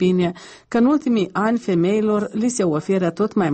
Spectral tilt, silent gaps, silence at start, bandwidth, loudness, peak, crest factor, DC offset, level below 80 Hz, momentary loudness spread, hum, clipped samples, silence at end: -6.5 dB/octave; none; 0 s; 8.8 kHz; -20 LUFS; -6 dBFS; 12 dB; under 0.1%; -58 dBFS; 4 LU; none; under 0.1%; 0 s